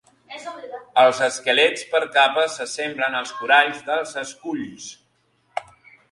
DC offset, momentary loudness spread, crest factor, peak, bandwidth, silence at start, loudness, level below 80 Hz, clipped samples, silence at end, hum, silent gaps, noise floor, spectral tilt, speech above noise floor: under 0.1%; 18 LU; 22 dB; 0 dBFS; 11.5 kHz; 0.3 s; -20 LUFS; -70 dBFS; under 0.1%; 0.5 s; none; none; -65 dBFS; -1.5 dB/octave; 44 dB